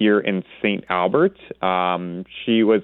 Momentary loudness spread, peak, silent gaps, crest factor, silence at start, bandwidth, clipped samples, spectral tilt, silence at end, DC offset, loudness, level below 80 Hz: 8 LU; -2 dBFS; none; 18 dB; 0 s; 4.2 kHz; under 0.1%; -9.5 dB/octave; 0 s; under 0.1%; -21 LUFS; -62 dBFS